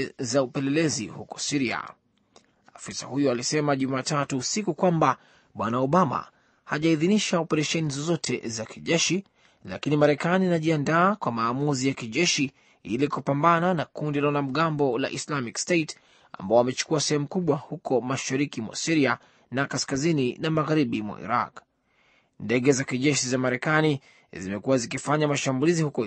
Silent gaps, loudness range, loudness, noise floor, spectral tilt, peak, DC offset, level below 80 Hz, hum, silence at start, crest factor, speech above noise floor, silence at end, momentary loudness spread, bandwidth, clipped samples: none; 3 LU; -25 LUFS; -65 dBFS; -4.5 dB/octave; -6 dBFS; under 0.1%; -66 dBFS; none; 0 s; 20 dB; 40 dB; 0 s; 11 LU; 8.8 kHz; under 0.1%